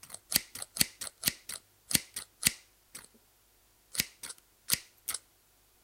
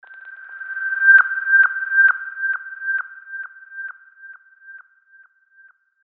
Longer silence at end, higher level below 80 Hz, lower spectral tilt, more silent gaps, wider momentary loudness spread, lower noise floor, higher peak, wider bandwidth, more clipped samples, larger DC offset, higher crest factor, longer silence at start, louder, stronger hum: second, 0.65 s vs 1.3 s; first, -64 dBFS vs under -90 dBFS; first, -0.5 dB/octave vs 10.5 dB/octave; neither; second, 19 LU vs 23 LU; first, -66 dBFS vs -53 dBFS; about the same, -2 dBFS vs -2 dBFS; first, 17 kHz vs 3.7 kHz; neither; neither; first, 36 dB vs 18 dB; about the same, 0.05 s vs 0.1 s; second, -33 LUFS vs -16 LUFS; neither